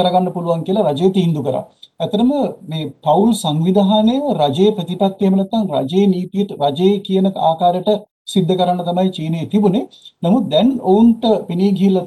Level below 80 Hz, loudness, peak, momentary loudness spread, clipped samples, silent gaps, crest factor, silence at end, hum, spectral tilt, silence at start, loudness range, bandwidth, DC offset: -56 dBFS; -16 LUFS; -2 dBFS; 8 LU; under 0.1%; 8.11-8.25 s; 14 dB; 0 s; none; -7.5 dB/octave; 0 s; 2 LU; 12.5 kHz; under 0.1%